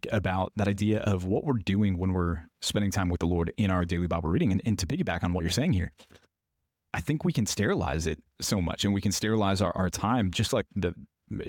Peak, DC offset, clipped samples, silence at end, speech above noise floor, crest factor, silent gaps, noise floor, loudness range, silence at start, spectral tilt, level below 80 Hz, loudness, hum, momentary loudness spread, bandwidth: -14 dBFS; under 0.1%; under 0.1%; 0 s; 55 dB; 14 dB; none; -83 dBFS; 2 LU; 0.05 s; -5.5 dB/octave; -44 dBFS; -28 LUFS; none; 6 LU; 17.5 kHz